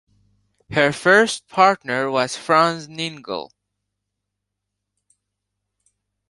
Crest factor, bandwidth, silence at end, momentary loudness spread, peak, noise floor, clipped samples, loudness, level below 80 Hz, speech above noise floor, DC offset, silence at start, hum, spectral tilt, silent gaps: 20 dB; 11.5 kHz; 2.85 s; 14 LU; -2 dBFS; -80 dBFS; under 0.1%; -19 LUFS; -62 dBFS; 61 dB; under 0.1%; 0.7 s; 50 Hz at -60 dBFS; -4 dB/octave; none